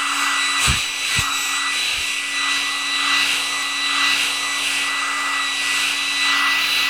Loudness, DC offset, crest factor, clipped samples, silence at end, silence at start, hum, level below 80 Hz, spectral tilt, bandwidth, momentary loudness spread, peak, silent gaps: -18 LUFS; 0.2%; 14 dB; under 0.1%; 0 s; 0 s; none; -42 dBFS; 0 dB/octave; over 20 kHz; 4 LU; -6 dBFS; none